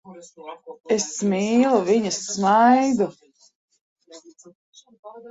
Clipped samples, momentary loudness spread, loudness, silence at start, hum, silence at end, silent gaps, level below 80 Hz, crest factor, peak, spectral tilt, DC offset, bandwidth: under 0.1%; 24 LU; -20 LUFS; 0.05 s; none; 0 s; 3.55-3.68 s, 3.81-3.96 s, 4.55-4.73 s, 4.99-5.03 s; -68 dBFS; 18 dB; -6 dBFS; -4.5 dB/octave; under 0.1%; 8 kHz